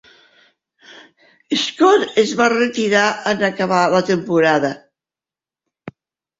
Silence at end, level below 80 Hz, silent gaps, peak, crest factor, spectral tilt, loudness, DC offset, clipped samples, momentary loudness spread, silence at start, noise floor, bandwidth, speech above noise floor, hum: 0.5 s; -62 dBFS; none; -2 dBFS; 18 dB; -4.5 dB/octave; -16 LUFS; under 0.1%; under 0.1%; 6 LU; 1.5 s; under -90 dBFS; 7.8 kHz; over 74 dB; none